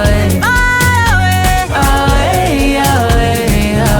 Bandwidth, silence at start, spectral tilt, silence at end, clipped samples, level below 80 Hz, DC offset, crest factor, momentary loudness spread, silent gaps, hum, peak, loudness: over 20 kHz; 0 s; -5 dB/octave; 0 s; under 0.1%; -18 dBFS; under 0.1%; 10 dB; 3 LU; none; none; 0 dBFS; -11 LUFS